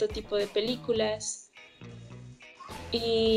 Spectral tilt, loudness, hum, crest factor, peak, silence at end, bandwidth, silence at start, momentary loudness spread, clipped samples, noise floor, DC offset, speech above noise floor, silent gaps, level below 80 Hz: -3.5 dB/octave; -30 LUFS; none; 16 dB; -16 dBFS; 0 s; 14 kHz; 0 s; 19 LU; under 0.1%; -49 dBFS; under 0.1%; 21 dB; none; -54 dBFS